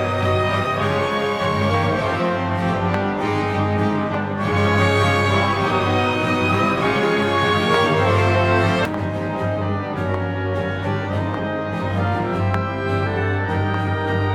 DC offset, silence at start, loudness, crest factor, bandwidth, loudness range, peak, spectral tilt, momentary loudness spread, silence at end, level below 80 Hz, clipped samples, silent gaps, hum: under 0.1%; 0 s; -20 LUFS; 18 dB; 12 kHz; 5 LU; -2 dBFS; -6.5 dB/octave; 6 LU; 0 s; -48 dBFS; under 0.1%; none; none